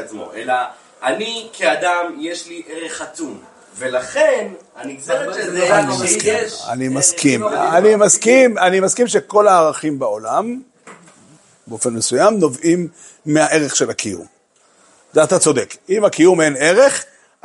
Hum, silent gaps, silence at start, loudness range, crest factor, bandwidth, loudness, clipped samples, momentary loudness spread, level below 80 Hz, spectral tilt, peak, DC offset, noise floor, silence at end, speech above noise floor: none; none; 0 s; 8 LU; 16 dB; 11.5 kHz; -15 LUFS; under 0.1%; 17 LU; -64 dBFS; -3.5 dB/octave; 0 dBFS; under 0.1%; -55 dBFS; 0.4 s; 39 dB